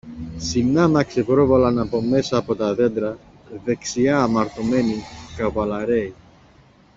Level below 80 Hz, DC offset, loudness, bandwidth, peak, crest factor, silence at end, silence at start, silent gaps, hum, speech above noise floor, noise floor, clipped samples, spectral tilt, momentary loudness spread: -46 dBFS; under 0.1%; -20 LUFS; 7.8 kHz; -4 dBFS; 16 dB; 0.85 s; 0.05 s; none; none; 32 dB; -52 dBFS; under 0.1%; -6 dB/octave; 13 LU